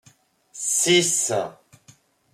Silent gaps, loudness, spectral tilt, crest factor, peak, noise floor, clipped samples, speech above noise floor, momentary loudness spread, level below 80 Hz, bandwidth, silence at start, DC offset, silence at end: none; -20 LUFS; -2 dB/octave; 18 dB; -6 dBFS; -58 dBFS; under 0.1%; 36 dB; 12 LU; -72 dBFS; 15 kHz; 0.55 s; under 0.1%; 0.8 s